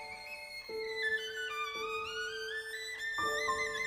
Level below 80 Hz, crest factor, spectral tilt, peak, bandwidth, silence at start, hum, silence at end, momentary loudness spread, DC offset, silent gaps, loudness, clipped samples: -66 dBFS; 16 dB; -0.5 dB/octave; -22 dBFS; 15.5 kHz; 0 s; none; 0 s; 10 LU; under 0.1%; none; -37 LUFS; under 0.1%